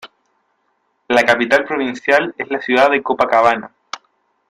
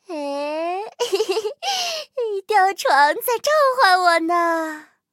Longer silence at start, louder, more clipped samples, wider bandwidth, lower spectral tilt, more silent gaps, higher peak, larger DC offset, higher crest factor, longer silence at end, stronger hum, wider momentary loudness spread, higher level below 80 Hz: about the same, 0.05 s vs 0.1 s; first, -15 LUFS vs -19 LUFS; neither; second, 14.5 kHz vs 16.5 kHz; first, -4 dB/octave vs 0 dB/octave; neither; about the same, 0 dBFS vs 0 dBFS; neither; about the same, 18 dB vs 20 dB; first, 0.55 s vs 0.3 s; neither; first, 18 LU vs 11 LU; first, -58 dBFS vs -82 dBFS